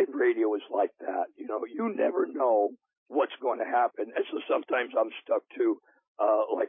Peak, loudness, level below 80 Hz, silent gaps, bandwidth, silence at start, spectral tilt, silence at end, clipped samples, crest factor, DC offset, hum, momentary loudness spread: -14 dBFS; -29 LUFS; under -90 dBFS; 2.97-3.06 s, 6.08-6.15 s; 3.8 kHz; 0 s; -8.5 dB/octave; 0 s; under 0.1%; 14 dB; under 0.1%; none; 7 LU